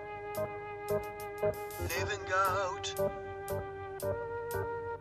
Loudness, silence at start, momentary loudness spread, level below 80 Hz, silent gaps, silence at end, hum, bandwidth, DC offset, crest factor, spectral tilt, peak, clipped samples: -36 LUFS; 0 s; 9 LU; -56 dBFS; none; 0 s; none; 14 kHz; under 0.1%; 16 dB; -4 dB/octave; -20 dBFS; under 0.1%